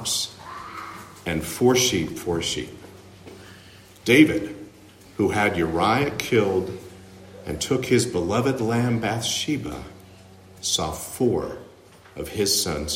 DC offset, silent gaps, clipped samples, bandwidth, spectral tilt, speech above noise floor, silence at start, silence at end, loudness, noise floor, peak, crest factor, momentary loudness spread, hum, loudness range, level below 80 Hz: under 0.1%; none; under 0.1%; 16 kHz; -4 dB/octave; 26 dB; 0 s; 0 s; -23 LUFS; -49 dBFS; -4 dBFS; 22 dB; 20 LU; none; 4 LU; -50 dBFS